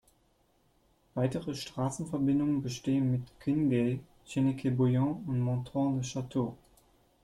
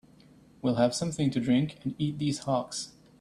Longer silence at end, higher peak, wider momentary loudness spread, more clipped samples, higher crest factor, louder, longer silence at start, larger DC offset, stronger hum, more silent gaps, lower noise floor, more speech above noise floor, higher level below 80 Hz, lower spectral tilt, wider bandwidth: first, 0.7 s vs 0.3 s; second, -16 dBFS vs -12 dBFS; about the same, 7 LU vs 9 LU; neither; about the same, 14 dB vs 18 dB; second, -32 LUFS vs -29 LUFS; first, 1.15 s vs 0.65 s; neither; neither; neither; first, -70 dBFS vs -57 dBFS; first, 39 dB vs 28 dB; about the same, -62 dBFS vs -62 dBFS; first, -7 dB/octave vs -5.5 dB/octave; about the same, 12 kHz vs 12.5 kHz